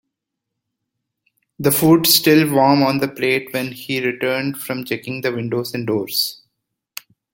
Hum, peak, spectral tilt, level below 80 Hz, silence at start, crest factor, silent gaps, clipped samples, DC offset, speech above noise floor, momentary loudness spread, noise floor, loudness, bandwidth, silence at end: none; 0 dBFS; -4 dB/octave; -60 dBFS; 1.6 s; 18 dB; none; under 0.1%; under 0.1%; 63 dB; 13 LU; -80 dBFS; -17 LUFS; 17 kHz; 1 s